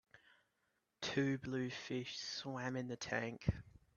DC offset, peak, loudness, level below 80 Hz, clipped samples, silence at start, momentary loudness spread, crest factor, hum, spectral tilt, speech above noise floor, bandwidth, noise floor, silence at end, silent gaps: under 0.1%; -22 dBFS; -42 LUFS; -60 dBFS; under 0.1%; 0.15 s; 5 LU; 22 dB; none; -5 dB/octave; 42 dB; 7.2 kHz; -84 dBFS; 0.25 s; none